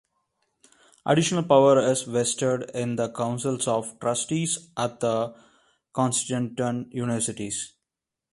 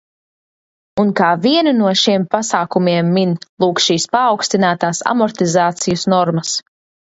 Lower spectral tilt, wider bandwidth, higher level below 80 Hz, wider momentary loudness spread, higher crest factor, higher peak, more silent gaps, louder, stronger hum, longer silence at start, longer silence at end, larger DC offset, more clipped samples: about the same, -4.5 dB/octave vs -4.5 dB/octave; first, 11.5 kHz vs 8 kHz; second, -64 dBFS vs -58 dBFS; first, 11 LU vs 5 LU; first, 22 dB vs 16 dB; second, -4 dBFS vs 0 dBFS; second, none vs 3.49-3.57 s; second, -25 LUFS vs -15 LUFS; neither; about the same, 1.05 s vs 0.95 s; about the same, 0.65 s vs 0.6 s; neither; neither